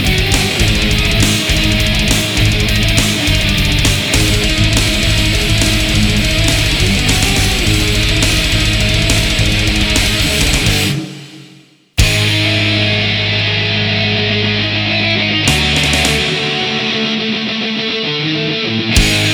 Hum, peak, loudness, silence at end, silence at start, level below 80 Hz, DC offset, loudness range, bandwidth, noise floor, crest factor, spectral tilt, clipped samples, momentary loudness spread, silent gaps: none; 0 dBFS; -12 LUFS; 0 s; 0 s; -20 dBFS; under 0.1%; 2 LU; over 20 kHz; -43 dBFS; 12 dB; -3.5 dB/octave; under 0.1%; 4 LU; none